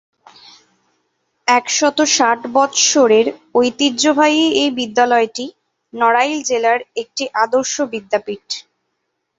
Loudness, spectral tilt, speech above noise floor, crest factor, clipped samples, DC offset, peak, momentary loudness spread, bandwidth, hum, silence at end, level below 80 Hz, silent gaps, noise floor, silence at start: -15 LUFS; -1.5 dB/octave; 57 dB; 16 dB; under 0.1%; under 0.1%; 0 dBFS; 12 LU; 8 kHz; none; 0.75 s; -64 dBFS; none; -72 dBFS; 1.45 s